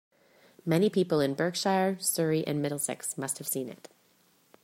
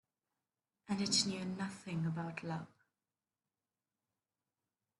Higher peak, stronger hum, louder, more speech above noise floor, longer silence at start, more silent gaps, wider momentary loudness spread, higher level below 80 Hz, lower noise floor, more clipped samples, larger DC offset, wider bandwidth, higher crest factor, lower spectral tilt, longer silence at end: first, -14 dBFS vs -18 dBFS; neither; first, -29 LUFS vs -38 LUFS; second, 37 dB vs over 51 dB; second, 0.65 s vs 0.9 s; neither; second, 8 LU vs 12 LU; first, -72 dBFS vs -78 dBFS; second, -66 dBFS vs under -90 dBFS; neither; neither; first, 16 kHz vs 11.5 kHz; second, 18 dB vs 26 dB; about the same, -4.5 dB/octave vs -3.5 dB/octave; second, 0.9 s vs 2.35 s